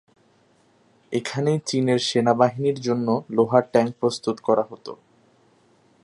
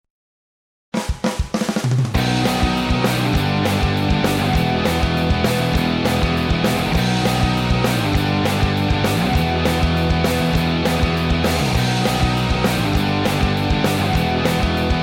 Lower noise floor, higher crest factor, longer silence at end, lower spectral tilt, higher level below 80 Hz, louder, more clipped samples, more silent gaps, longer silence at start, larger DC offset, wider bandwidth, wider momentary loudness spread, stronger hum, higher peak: second, -60 dBFS vs under -90 dBFS; first, 22 dB vs 12 dB; first, 1.1 s vs 0 s; about the same, -5.5 dB/octave vs -5.5 dB/octave; second, -68 dBFS vs -26 dBFS; second, -22 LUFS vs -18 LUFS; neither; neither; first, 1.1 s vs 0.95 s; neither; second, 11.5 kHz vs 16.5 kHz; first, 9 LU vs 1 LU; neither; first, -2 dBFS vs -6 dBFS